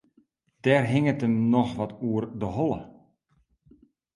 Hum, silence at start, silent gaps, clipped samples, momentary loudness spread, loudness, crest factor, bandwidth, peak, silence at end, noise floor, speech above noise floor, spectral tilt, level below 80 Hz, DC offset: none; 0.65 s; none; under 0.1%; 8 LU; -26 LUFS; 20 dB; 11.5 kHz; -6 dBFS; 1.25 s; -69 dBFS; 44 dB; -8 dB/octave; -56 dBFS; under 0.1%